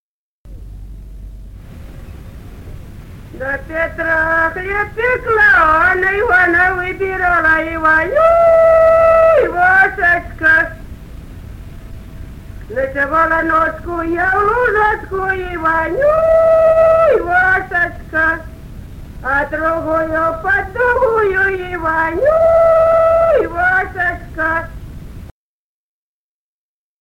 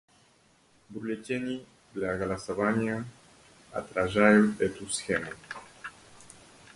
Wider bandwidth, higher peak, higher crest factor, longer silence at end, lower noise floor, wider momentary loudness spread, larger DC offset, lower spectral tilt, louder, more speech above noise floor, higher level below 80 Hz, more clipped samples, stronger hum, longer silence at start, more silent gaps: first, 16 kHz vs 11.5 kHz; first, 0 dBFS vs -6 dBFS; second, 14 dB vs 24 dB; first, 1.7 s vs 0.5 s; first, under -90 dBFS vs -63 dBFS; second, 14 LU vs 22 LU; neither; first, -6.5 dB/octave vs -5 dB/octave; first, -13 LUFS vs -29 LUFS; first, over 77 dB vs 35 dB; first, -34 dBFS vs -58 dBFS; neither; neither; second, 0.45 s vs 0.9 s; neither